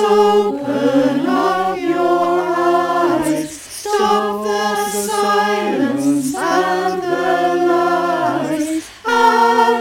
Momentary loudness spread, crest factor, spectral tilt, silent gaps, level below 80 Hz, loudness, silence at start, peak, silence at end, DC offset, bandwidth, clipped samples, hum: 7 LU; 14 dB; -4 dB/octave; none; -56 dBFS; -16 LUFS; 0 s; 0 dBFS; 0 s; under 0.1%; 17 kHz; under 0.1%; none